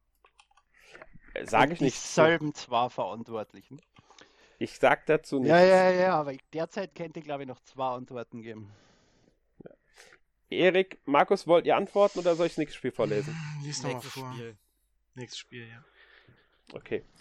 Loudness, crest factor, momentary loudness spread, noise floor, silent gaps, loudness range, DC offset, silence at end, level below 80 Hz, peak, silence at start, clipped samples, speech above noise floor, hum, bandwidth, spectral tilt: -27 LUFS; 22 dB; 19 LU; -72 dBFS; none; 15 LU; under 0.1%; 0.2 s; -62 dBFS; -6 dBFS; 1.15 s; under 0.1%; 45 dB; none; 13 kHz; -5 dB/octave